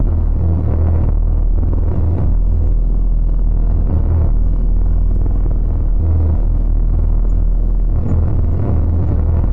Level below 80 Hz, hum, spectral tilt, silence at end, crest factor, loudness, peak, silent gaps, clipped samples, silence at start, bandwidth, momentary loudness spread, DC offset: -14 dBFS; none; -12 dB/octave; 0 s; 8 dB; -17 LUFS; -4 dBFS; none; under 0.1%; 0 s; 2 kHz; 3 LU; 9%